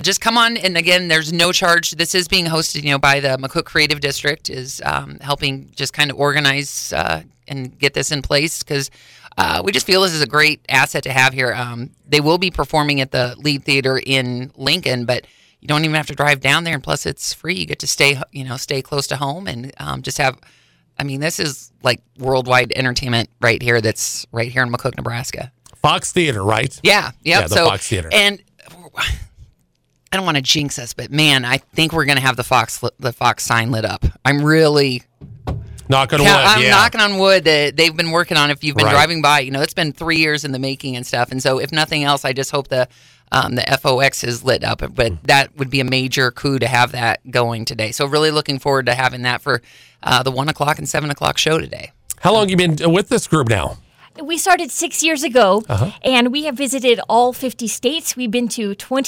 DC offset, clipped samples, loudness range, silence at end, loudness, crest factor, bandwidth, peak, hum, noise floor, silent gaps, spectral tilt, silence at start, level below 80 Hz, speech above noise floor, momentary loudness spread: under 0.1%; under 0.1%; 5 LU; 0 s; -16 LUFS; 16 dB; 17 kHz; -2 dBFS; none; -62 dBFS; none; -3.5 dB/octave; 0 s; -40 dBFS; 46 dB; 10 LU